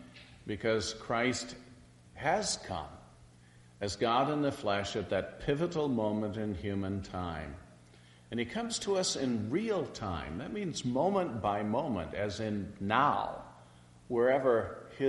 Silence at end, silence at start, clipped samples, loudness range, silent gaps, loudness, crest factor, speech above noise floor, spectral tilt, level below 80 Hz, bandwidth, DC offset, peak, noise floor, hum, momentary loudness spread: 0 s; 0 s; under 0.1%; 3 LU; none; -33 LUFS; 22 dB; 26 dB; -4.5 dB/octave; -58 dBFS; 11.5 kHz; under 0.1%; -12 dBFS; -58 dBFS; none; 12 LU